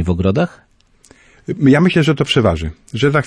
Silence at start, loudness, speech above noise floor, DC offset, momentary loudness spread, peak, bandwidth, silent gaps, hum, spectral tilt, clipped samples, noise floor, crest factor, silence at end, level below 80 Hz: 0 s; -15 LUFS; 35 dB; under 0.1%; 14 LU; -2 dBFS; 11 kHz; none; none; -6.5 dB/octave; under 0.1%; -49 dBFS; 14 dB; 0 s; -36 dBFS